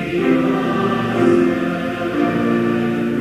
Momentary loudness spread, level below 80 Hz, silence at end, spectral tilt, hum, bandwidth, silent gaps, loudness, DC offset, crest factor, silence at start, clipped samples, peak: 6 LU; -48 dBFS; 0 s; -7 dB/octave; none; 14 kHz; none; -17 LUFS; under 0.1%; 14 dB; 0 s; under 0.1%; -4 dBFS